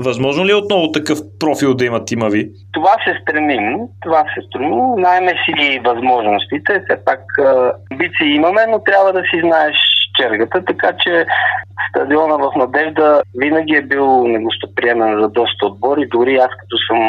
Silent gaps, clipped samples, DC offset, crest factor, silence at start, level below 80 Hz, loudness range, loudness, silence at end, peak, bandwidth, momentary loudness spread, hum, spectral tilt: none; under 0.1%; under 0.1%; 14 dB; 0 s; -58 dBFS; 3 LU; -14 LUFS; 0 s; 0 dBFS; 14 kHz; 6 LU; none; -4.5 dB/octave